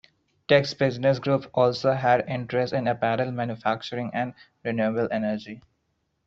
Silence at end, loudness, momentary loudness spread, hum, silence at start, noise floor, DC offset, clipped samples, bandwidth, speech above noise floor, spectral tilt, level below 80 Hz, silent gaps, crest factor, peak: 0.65 s; -25 LUFS; 11 LU; none; 0.5 s; -74 dBFS; under 0.1%; under 0.1%; 7.6 kHz; 49 dB; -4.5 dB/octave; -62 dBFS; none; 20 dB; -4 dBFS